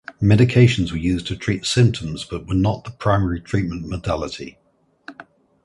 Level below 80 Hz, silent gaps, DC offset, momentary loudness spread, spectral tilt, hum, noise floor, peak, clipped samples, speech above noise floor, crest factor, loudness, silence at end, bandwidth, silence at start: -38 dBFS; none; under 0.1%; 15 LU; -6.5 dB/octave; none; -46 dBFS; -2 dBFS; under 0.1%; 27 dB; 18 dB; -20 LUFS; 0.45 s; 11.5 kHz; 0.1 s